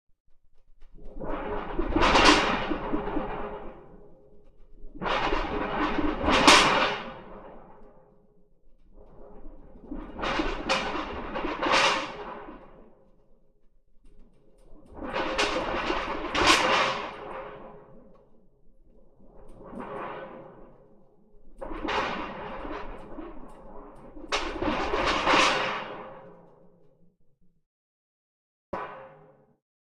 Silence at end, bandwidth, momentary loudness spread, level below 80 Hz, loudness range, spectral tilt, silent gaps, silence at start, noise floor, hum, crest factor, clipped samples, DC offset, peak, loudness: 0.85 s; 14 kHz; 25 LU; -42 dBFS; 20 LU; -3 dB/octave; 27.66-28.73 s; 0.3 s; -59 dBFS; none; 26 dB; under 0.1%; under 0.1%; -4 dBFS; -25 LUFS